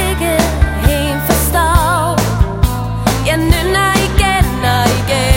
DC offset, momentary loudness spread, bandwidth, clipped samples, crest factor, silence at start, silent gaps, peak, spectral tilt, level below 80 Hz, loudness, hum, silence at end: under 0.1%; 4 LU; 17 kHz; 0.3%; 12 dB; 0 s; none; 0 dBFS; -4.5 dB/octave; -18 dBFS; -13 LUFS; none; 0 s